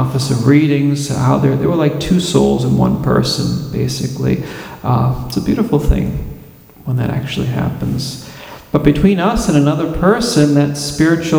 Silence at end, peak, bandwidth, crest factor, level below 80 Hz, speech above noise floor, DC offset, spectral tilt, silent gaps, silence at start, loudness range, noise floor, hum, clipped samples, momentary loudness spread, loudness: 0 s; 0 dBFS; 17 kHz; 14 dB; -30 dBFS; 25 dB; under 0.1%; -6.5 dB/octave; none; 0 s; 5 LU; -38 dBFS; none; under 0.1%; 10 LU; -15 LUFS